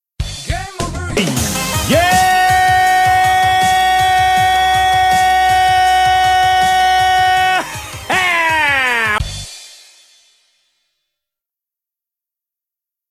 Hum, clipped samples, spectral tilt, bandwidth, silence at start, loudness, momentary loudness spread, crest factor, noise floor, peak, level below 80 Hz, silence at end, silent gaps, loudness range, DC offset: none; under 0.1%; -2.5 dB/octave; 16 kHz; 0.2 s; -12 LUFS; 12 LU; 14 dB; -85 dBFS; 0 dBFS; -32 dBFS; 3.45 s; none; 6 LU; under 0.1%